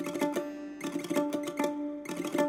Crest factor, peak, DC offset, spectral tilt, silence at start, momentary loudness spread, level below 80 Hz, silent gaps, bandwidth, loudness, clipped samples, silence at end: 18 dB; -16 dBFS; under 0.1%; -4.5 dB/octave; 0 s; 6 LU; -72 dBFS; none; 16.5 kHz; -34 LUFS; under 0.1%; 0 s